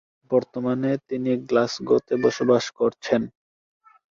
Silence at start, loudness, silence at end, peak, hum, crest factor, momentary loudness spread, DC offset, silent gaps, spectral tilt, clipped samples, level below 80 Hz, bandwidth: 0.3 s; -23 LUFS; 0.85 s; -4 dBFS; none; 20 dB; 5 LU; under 0.1%; none; -6 dB/octave; under 0.1%; -64 dBFS; 7.6 kHz